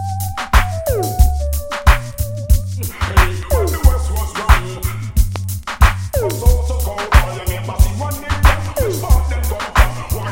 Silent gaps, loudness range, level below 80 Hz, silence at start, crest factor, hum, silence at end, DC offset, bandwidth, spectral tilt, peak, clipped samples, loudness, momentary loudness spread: none; 1 LU; -16 dBFS; 0 s; 14 dB; none; 0 s; under 0.1%; 17 kHz; -5 dB/octave; 0 dBFS; 0.1%; -17 LUFS; 7 LU